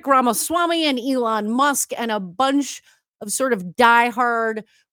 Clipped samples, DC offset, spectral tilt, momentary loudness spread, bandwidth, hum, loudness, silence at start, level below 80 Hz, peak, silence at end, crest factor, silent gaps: under 0.1%; under 0.1%; -2.5 dB/octave; 11 LU; 19.5 kHz; none; -19 LUFS; 0.05 s; -66 dBFS; 0 dBFS; 0.3 s; 20 dB; 3.08-3.14 s